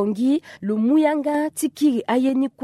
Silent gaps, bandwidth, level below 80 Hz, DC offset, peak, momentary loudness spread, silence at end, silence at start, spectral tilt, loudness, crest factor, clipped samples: none; 13.5 kHz; -70 dBFS; under 0.1%; -6 dBFS; 6 LU; 0 s; 0 s; -5.5 dB/octave; -21 LUFS; 14 dB; under 0.1%